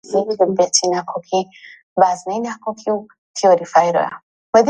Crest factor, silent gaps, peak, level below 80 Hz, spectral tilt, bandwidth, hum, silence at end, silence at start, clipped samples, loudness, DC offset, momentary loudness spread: 18 dB; 1.83-1.96 s, 3.18-3.34 s, 4.23-4.53 s; 0 dBFS; -64 dBFS; -3 dB/octave; 10.5 kHz; none; 0 s; 0.1 s; under 0.1%; -18 LUFS; under 0.1%; 11 LU